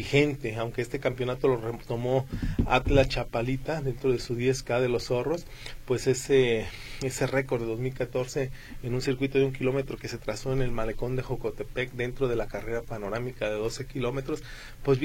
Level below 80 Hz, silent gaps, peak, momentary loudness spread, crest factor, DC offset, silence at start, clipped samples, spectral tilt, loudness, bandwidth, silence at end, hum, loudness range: -40 dBFS; none; -6 dBFS; 10 LU; 22 dB; under 0.1%; 0 s; under 0.1%; -6 dB/octave; -29 LUFS; 16.5 kHz; 0 s; none; 4 LU